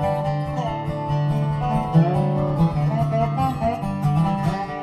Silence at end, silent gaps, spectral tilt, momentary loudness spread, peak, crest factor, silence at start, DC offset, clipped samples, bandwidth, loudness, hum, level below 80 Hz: 0 s; none; -9 dB/octave; 6 LU; -4 dBFS; 16 dB; 0 s; under 0.1%; under 0.1%; 9.8 kHz; -22 LUFS; none; -40 dBFS